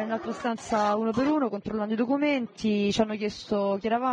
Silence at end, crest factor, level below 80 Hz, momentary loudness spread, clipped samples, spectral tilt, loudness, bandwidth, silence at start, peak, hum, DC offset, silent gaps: 0 s; 18 dB; -58 dBFS; 6 LU; under 0.1%; -5.5 dB/octave; -27 LUFS; 9.8 kHz; 0 s; -10 dBFS; none; under 0.1%; none